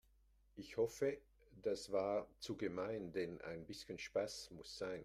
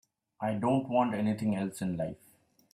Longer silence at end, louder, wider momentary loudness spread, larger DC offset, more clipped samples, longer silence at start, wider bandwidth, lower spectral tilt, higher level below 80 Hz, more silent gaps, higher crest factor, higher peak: second, 0 s vs 0.6 s; second, -44 LUFS vs -31 LUFS; about the same, 11 LU vs 9 LU; neither; neither; first, 0.55 s vs 0.4 s; first, 15.5 kHz vs 14 kHz; second, -4.5 dB/octave vs -7.5 dB/octave; about the same, -72 dBFS vs -68 dBFS; neither; about the same, 18 dB vs 20 dB; second, -26 dBFS vs -12 dBFS